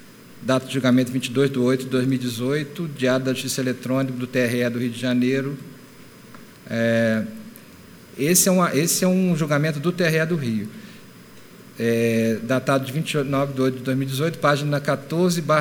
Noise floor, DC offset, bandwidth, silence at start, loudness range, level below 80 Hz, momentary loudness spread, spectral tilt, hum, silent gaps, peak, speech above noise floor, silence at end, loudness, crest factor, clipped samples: -45 dBFS; under 0.1%; over 20 kHz; 0 s; 4 LU; -64 dBFS; 9 LU; -5 dB/octave; none; none; -4 dBFS; 24 dB; 0 s; -22 LUFS; 18 dB; under 0.1%